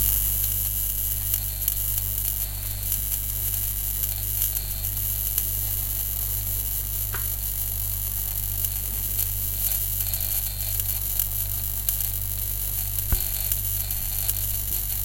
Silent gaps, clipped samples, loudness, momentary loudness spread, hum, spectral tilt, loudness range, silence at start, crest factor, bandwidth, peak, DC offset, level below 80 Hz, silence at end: none; under 0.1%; -24 LUFS; 3 LU; 50 Hz at -35 dBFS; -2 dB/octave; 1 LU; 0 s; 22 dB; 17.5 kHz; -4 dBFS; under 0.1%; -34 dBFS; 0 s